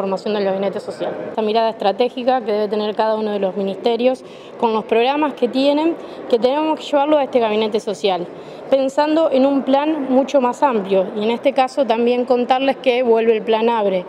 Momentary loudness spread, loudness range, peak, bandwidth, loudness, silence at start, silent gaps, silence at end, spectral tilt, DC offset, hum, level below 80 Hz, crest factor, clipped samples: 6 LU; 3 LU; -2 dBFS; 11 kHz; -18 LUFS; 0 s; none; 0 s; -5.5 dB/octave; under 0.1%; none; -66 dBFS; 14 dB; under 0.1%